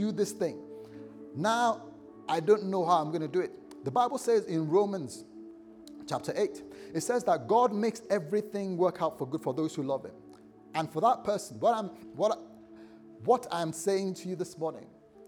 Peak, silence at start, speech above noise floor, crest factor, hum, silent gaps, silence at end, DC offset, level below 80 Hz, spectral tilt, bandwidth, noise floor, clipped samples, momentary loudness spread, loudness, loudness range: -12 dBFS; 0 s; 24 dB; 18 dB; none; none; 0.05 s; under 0.1%; -76 dBFS; -5.5 dB/octave; 18.5 kHz; -53 dBFS; under 0.1%; 19 LU; -30 LUFS; 3 LU